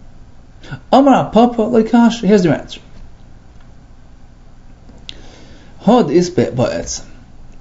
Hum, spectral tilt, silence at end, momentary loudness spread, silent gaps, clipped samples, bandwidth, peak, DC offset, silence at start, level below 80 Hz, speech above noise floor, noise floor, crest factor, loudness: 60 Hz at -45 dBFS; -6 dB/octave; 0.1 s; 23 LU; none; under 0.1%; 7.8 kHz; 0 dBFS; under 0.1%; 0.6 s; -38 dBFS; 26 dB; -38 dBFS; 16 dB; -13 LUFS